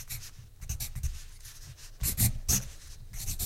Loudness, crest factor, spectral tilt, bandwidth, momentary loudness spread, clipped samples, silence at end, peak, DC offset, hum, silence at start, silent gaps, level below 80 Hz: -32 LUFS; 22 dB; -2.5 dB/octave; 16.5 kHz; 20 LU; under 0.1%; 0 s; -12 dBFS; under 0.1%; none; 0 s; none; -40 dBFS